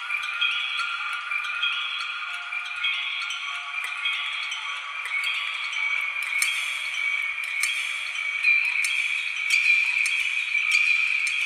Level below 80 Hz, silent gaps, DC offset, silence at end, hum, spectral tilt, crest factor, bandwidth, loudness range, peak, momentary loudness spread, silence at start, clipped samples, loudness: -74 dBFS; none; under 0.1%; 0 s; none; 5.5 dB/octave; 20 dB; 14 kHz; 6 LU; -6 dBFS; 10 LU; 0 s; under 0.1%; -23 LUFS